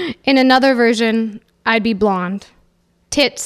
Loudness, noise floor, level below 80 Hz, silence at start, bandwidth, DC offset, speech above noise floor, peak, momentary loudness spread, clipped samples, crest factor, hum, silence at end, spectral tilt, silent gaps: -15 LUFS; -58 dBFS; -50 dBFS; 0 s; 14.5 kHz; under 0.1%; 44 dB; 0 dBFS; 12 LU; under 0.1%; 16 dB; none; 0 s; -4 dB/octave; none